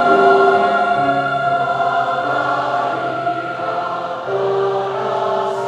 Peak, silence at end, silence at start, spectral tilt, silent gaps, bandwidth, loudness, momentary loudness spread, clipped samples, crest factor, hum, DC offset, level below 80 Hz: -2 dBFS; 0 s; 0 s; -6 dB/octave; none; 9.6 kHz; -17 LUFS; 10 LU; under 0.1%; 16 dB; none; under 0.1%; -60 dBFS